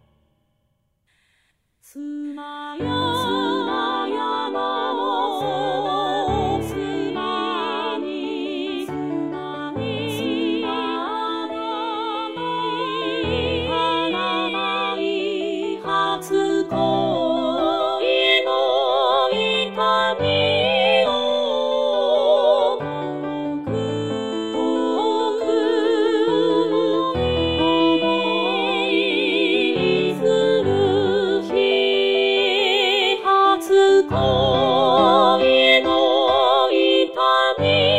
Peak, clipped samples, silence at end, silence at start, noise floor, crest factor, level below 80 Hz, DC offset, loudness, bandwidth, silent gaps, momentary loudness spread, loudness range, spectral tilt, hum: -2 dBFS; under 0.1%; 0 s; 1.95 s; -68 dBFS; 18 dB; -48 dBFS; 0.2%; -19 LUFS; 15.5 kHz; none; 10 LU; 9 LU; -5 dB/octave; none